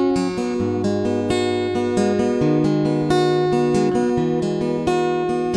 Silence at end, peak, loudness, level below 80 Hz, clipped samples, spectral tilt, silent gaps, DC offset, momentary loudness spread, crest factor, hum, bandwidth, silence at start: 0 s; -6 dBFS; -20 LUFS; -46 dBFS; under 0.1%; -6.5 dB/octave; none; under 0.1%; 3 LU; 12 dB; none; 11 kHz; 0 s